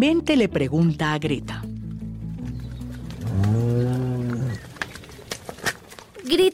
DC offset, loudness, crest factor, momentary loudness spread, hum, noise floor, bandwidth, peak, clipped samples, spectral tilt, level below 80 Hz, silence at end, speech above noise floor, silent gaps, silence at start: under 0.1%; -25 LUFS; 14 dB; 15 LU; none; -43 dBFS; 16 kHz; -8 dBFS; under 0.1%; -6 dB/octave; -44 dBFS; 0 s; 22 dB; none; 0 s